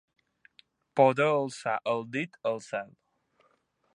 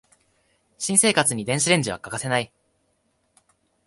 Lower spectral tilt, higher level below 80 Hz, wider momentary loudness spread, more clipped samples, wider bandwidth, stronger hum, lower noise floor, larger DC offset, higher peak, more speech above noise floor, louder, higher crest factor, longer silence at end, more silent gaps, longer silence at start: first, -5.5 dB/octave vs -3 dB/octave; second, -82 dBFS vs -60 dBFS; about the same, 14 LU vs 13 LU; neither; about the same, 11 kHz vs 12 kHz; neither; about the same, -71 dBFS vs -69 dBFS; neither; second, -8 dBFS vs -2 dBFS; second, 43 dB vs 47 dB; second, -29 LUFS vs -21 LUFS; about the same, 22 dB vs 22 dB; second, 1.1 s vs 1.4 s; neither; first, 0.95 s vs 0.8 s